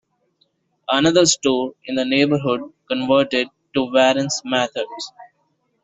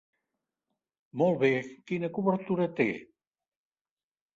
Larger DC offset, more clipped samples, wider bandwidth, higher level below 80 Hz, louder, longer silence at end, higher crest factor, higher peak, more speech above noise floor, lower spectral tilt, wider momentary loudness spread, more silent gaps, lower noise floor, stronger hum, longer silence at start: neither; neither; about the same, 8.2 kHz vs 7.6 kHz; first, -60 dBFS vs -74 dBFS; first, -19 LUFS vs -29 LUFS; second, 0.6 s vs 1.3 s; about the same, 18 dB vs 20 dB; first, -2 dBFS vs -12 dBFS; second, 49 dB vs over 62 dB; second, -3.5 dB/octave vs -8 dB/octave; about the same, 12 LU vs 10 LU; neither; second, -67 dBFS vs under -90 dBFS; neither; second, 0.9 s vs 1.15 s